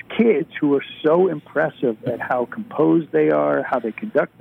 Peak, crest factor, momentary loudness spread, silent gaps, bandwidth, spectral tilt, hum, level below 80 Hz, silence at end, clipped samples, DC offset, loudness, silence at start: -6 dBFS; 14 dB; 6 LU; none; 4.2 kHz; -9 dB/octave; none; -66 dBFS; 0.15 s; under 0.1%; under 0.1%; -20 LUFS; 0.1 s